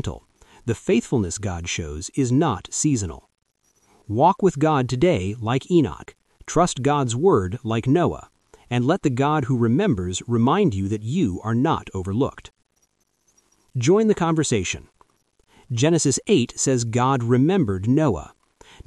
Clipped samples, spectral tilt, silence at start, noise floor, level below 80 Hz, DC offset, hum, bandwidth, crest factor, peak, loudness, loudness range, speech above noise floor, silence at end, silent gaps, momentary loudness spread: under 0.1%; -5.5 dB/octave; 0.05 s; -68 dBFS; -46 dBFS; under 0.1%; none; 12 kHz; 18 dB; -4 dBFS; -21 LUFS; 3 LU; 47 dB; 0.6 s; none; 9 LU